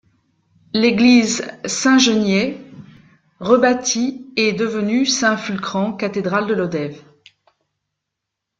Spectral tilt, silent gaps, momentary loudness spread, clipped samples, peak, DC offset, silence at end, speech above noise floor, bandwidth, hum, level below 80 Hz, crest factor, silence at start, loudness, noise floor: -3.5 dB/octave; none; 11 LU; under 0.1%; -2 dBFS; under 0.1%; 1.6 s; 64 dB; 9.2 kHz; none; -60 dBFS; 18 dB; 0.75 s; -17 LUFS; -80 dBFS